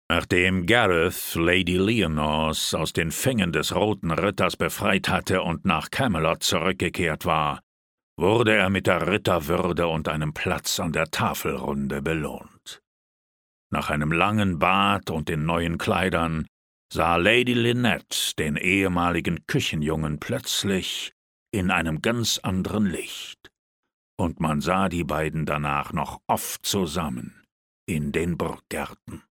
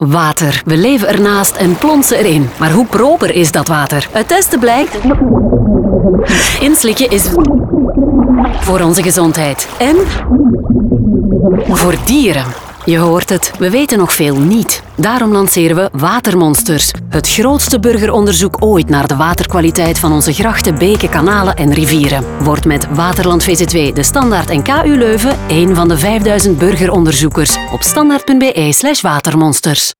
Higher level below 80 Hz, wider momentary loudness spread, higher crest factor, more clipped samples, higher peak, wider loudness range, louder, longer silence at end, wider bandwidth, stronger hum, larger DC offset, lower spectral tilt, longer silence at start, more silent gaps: second, -46 dBFS vs -24 dBFS; first, 10 LU vs 3 LU; first, 22 dB vs 10 dB; neither; about the same, -2 dBFS vs 0 dBFS; first, 5 LU vs 1 LU; second, -24 LUFS vs -10 LUFS; about the same, 0.15 s vs 0.1 s; about the same, 19.5 kHz vs over 20 kHz; neither; neither; about the same, -4.5 dB/octave vs -4.5 dB/octave; about the same, 0.1 s vs 0 s; first, 7.63-8.16 s, 12.87-13.70 s, 16.48-16.89 s, 21.12-21.46 s, 23.59-23.83 s, 23.93-24.17 s, 27.52-27.87 s vs none